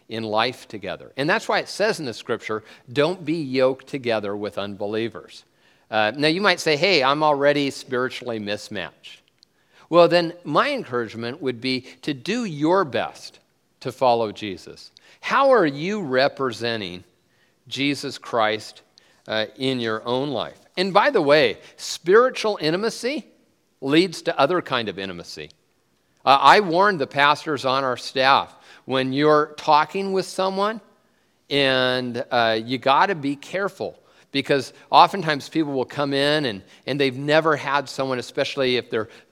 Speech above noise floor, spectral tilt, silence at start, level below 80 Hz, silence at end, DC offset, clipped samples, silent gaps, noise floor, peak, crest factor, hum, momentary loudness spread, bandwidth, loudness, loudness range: 44 dB; -4.5 dB/octave; 0.1 s; -68 dBFS; 0.25 s; under 0.1%; under 0.1%; none; -66 dBFS; 0 dBFS; 22 dB; none; 14 LU; 15 kHz; -21 LUFS; 5 LU